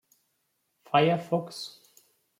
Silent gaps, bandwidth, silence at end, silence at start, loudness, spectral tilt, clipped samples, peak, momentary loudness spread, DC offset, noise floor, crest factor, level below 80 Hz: none; 16 kHz; 0.7 s; 0.95 s; -27 LUFS; -6 dB/octave; under 0.1%; -8 dBFS; 16 LU; under 0.1%; -76 dBFS; 24 dB; -76 dBFS